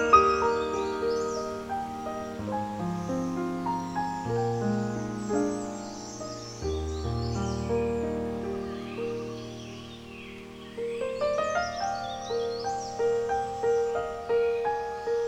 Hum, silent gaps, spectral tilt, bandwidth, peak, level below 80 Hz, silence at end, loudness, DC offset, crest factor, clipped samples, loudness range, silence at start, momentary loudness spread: none; none; -5.5 dB/octave; 12.5 kHz; -6 dBFS; -48 dBFS; 0 s; -30 LUFS; under 0.1%; 24 dB; under 0.1%; 4 LU; 0 s; 11 LU